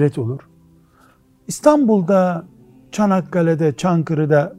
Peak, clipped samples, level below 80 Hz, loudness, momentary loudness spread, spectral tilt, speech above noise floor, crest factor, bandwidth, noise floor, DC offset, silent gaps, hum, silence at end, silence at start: 0 dBFS; under 0.1%; -56 dBFS; -17 LUFS; 14 LU; -7 dB/octave; 37 dB; 18 dB; 15 kHz; -53 dBFS; under 0.1%; none; none; 0 s; 0 s